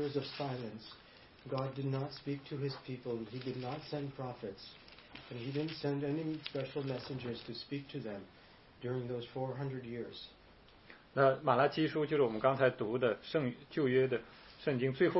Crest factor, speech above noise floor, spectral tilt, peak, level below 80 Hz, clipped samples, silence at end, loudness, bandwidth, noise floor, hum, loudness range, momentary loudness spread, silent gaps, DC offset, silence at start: 22 dB; 25 dB; -5 dB/octave; -14 dBFS; -70 dBFS; under 0.1%; 0 s; -37 LUFS; 5.8 kHz; -61 dBFS; none; 10 LU; 18 LU; none; under 0.1%; 0 s